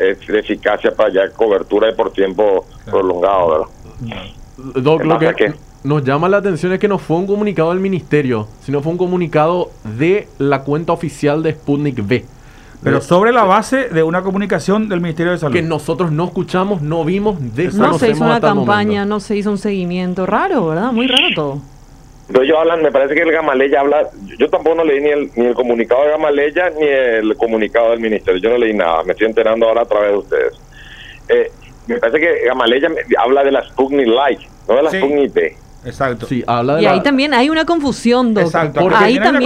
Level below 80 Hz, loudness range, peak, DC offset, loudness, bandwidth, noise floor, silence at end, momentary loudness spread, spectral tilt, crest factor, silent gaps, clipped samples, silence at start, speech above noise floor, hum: -42 dBFS; 3 LU; 0 dBFS; under 0.1%; -14 LUFS; 12.5 kHz; -39 dBFS; 0 s; 7 LU; -6.5 dB/octave; 14 dB; none; under 0.1%; 0 s; 26 dB; none